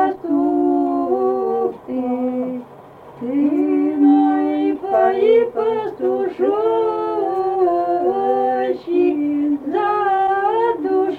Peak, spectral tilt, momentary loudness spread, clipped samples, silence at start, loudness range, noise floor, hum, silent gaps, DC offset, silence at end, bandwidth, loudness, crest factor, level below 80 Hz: -4 dBFS; -7.5 dB/octave; 6 LU; under 0.1%; 0 s; 4 LU; -40 dBFS; none; none; under 0.1%; 0 s; 4.6 kHz; -18 LUFS; 14 dB; -60 dBFS